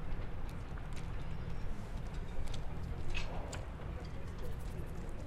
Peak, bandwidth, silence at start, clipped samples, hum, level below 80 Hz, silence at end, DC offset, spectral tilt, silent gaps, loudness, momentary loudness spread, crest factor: -24 dBFS; 11.5 kHz; 0 s; under 0.1%; none; -42 dBFS; 0 s; under 0.1%; -6 dB/octave; none; -45 LUFS; 4 LU; 14 dB